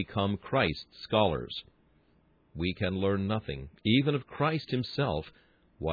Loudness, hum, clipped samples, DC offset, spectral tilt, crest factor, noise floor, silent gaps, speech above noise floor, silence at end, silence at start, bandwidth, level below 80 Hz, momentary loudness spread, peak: -31 LUFS; none; under 0.1%; under 0.1%; -8 dB/octave; 20 dB; -66 dBFS; none; 36 dB; 0 s; 0 s; 5 kHz; -52 dBFS; 13 LU; -12 dBFS